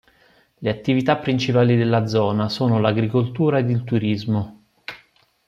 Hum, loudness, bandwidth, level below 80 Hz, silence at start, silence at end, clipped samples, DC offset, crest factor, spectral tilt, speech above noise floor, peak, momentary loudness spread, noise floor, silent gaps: none; -20 LUFS; 7.4 kHz; -58 dBFS; 0.6 s; 0.5 s; under 0.1%; under 0.1%; 18 dB; -7.5 dB/octave; 38 dB; -4 dBFS; 14 LU; -57 dBFS; none